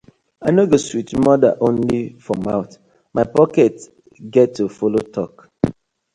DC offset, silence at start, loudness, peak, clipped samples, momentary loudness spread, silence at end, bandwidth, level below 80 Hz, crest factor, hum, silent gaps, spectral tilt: under 0.1%; 0.4 s; -18 LUFS; 0 dBFS; under 0.1%; 11 LU; 0.4 s; 11 kHz; -50 dBFS; 18 dB; none; none; -7 dB/octave